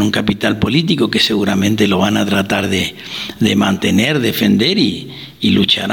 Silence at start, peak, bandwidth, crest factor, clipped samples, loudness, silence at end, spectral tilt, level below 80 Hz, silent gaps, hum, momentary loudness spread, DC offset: 0 s; 0 dBFS; 19.5 kHz; 14 dB; under 0.1%; -14 LUFS; 0 s; -5 dB/octave; -44 dBFS; none; none; 6 LU; 0.1%